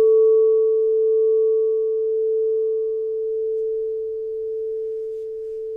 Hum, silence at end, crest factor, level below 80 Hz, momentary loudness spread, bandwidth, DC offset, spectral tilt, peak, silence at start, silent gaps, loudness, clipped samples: none; 0 s; 10 dB; -62 dBFS; 12 LU; 1.2 kHz; under 0.1%; -8 dB/octave; -10 dBFS; 0 s; none; -21 LUFS; under 0.1%